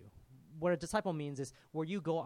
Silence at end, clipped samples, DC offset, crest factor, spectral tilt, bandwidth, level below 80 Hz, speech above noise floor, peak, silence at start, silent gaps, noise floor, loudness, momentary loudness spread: 0 s; under 0.1%; under 0.1%; 18 dB; -6 dB/octave; 16 kHz; -64 dBFS; 22 dB; -20 dBFS; 0 s; none; -59 dBFS; -38 LUFS; 9 LU